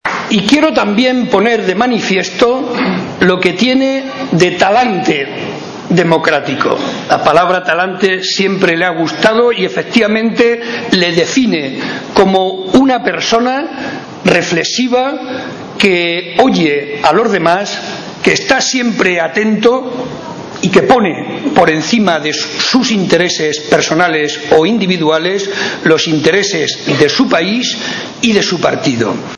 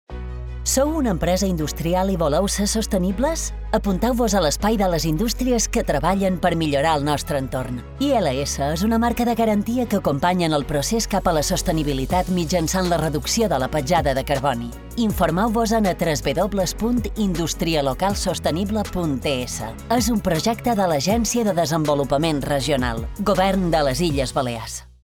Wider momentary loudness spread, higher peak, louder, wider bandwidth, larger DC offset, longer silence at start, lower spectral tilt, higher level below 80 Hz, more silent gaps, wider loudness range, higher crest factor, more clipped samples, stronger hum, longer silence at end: about the same, 7 LU vs 5 LU; first, 0 dBFS vs -6 dBFS; first, -11 LUFS vs -21 LUFS; second, 11 kHz vs 19 kHz; neither; about the same, 0.05 s vs 0.1 s; about the same, -4 dB/octave vs -5 dB/octave; second, -48 dBFS vs -32 dBFS; neither; about the same, 1 LU vs 2 LU; about the same, 12 dB vs 14 dB; first, 0.8% vs under 0.1%; neither; second, 0 s vs 0.2 s